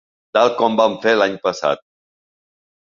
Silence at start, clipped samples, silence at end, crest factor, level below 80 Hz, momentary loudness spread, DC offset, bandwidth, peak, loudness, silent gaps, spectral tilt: 0.35 s; under 0.1%; 1.2 s; 18 dB; -64 dBFS; 6 LU; under 0.1%; 7.4 kHz; 0 dBFS; -17 LUFS; none; -4 dB/octave